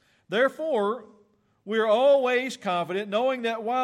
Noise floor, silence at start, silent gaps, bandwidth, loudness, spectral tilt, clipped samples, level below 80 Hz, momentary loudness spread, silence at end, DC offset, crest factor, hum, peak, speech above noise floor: -63 dBFS; 0.3 s; none; 13 kHz; -25 LUFS; -4.5 dB/octave; under 0.1%; -82 dBFS; 10 LU; 0 s; under 0.1%; 14 dB; none; -12 dBFS; 39 dB